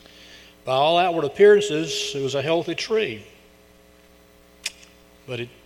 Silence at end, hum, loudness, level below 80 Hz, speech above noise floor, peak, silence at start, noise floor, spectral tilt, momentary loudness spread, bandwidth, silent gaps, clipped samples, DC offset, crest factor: 0.15 s; none; -21 LUFS; -60 dBFS; 32 dB; -4 dBFS; 0.35 s; -53 dBFS; -4 dB/octave; 18 LU; 13 kHz; none; under 0.1%; under 0.1%; 18 dB